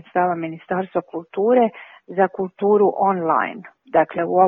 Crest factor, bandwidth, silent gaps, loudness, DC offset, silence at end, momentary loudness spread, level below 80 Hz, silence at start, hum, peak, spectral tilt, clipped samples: 18 dB; 3.8 kHz; none; -20 LUFS; under 0.1%; 0 s; 11 LU; -68 dBFS; 0.15 s; none; -2 dBFS; -10.5 dB/octave; under 0.1%